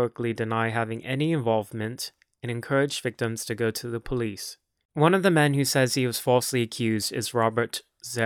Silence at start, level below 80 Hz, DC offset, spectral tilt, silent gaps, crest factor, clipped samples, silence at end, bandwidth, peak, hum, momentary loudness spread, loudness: 0 s; -56 dBFS; under 0.1%; -5 dB/octave; 4.85-4.89 s; 20 dB; under 0.1%; 0 s; over 20 kHz; -6 dBFS; none; 13 LU; -26 LUFS